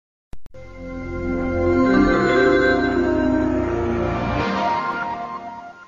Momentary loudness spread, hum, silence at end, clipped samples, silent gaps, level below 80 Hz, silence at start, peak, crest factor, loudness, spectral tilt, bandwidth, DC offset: 15 LU; none; 0.05 s; under 0.1%; none; -36 dBFS; 0.35 s; -6 dBFS; 14 dB; -20 LUFS; -7 dB/octave; 7.4 kHz; under 0.1%